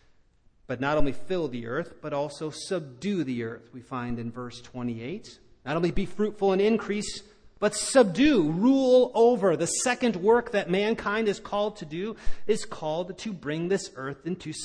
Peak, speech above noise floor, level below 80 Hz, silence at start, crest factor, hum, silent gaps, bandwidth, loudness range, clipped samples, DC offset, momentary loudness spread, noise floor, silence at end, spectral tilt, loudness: -8 dBFS; 35 dB; -46 dBFS; 0.7 s; 18 dB; none; none; 10.5 kHz; 10 LU; under 0.1%; under 0.1%; 15 LU; -60 dBFS; 0 s; -5 dB/octave; -27 LUFS